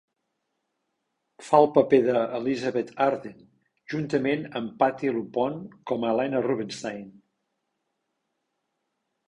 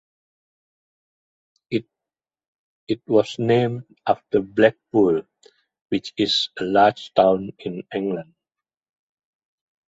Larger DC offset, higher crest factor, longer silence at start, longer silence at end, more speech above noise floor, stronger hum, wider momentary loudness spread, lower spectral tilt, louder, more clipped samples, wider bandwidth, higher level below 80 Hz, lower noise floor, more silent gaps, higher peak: neither; about the same, 22 dB vs 22 dB; second, 1.4 s vs 1.7 s; first, 2.2 s vs 1.65 s; second, 54 dB vs 69 dB; neither; first, 14 LU vs 11 LU; about the same, -6.5 dB/octave vs -6 dB/octave; second, -25 LUFS vs -21 LUFS; neither; first, 11 kHz vs 8 kHz; second, -68 dBFS vs -62 dBFS; second, -79 dBFS vs -90 dBFS; second, none vs 2.48-2.87 s, 5.81-5.85 s; about the same, -4 dBFS vs -2 dBFS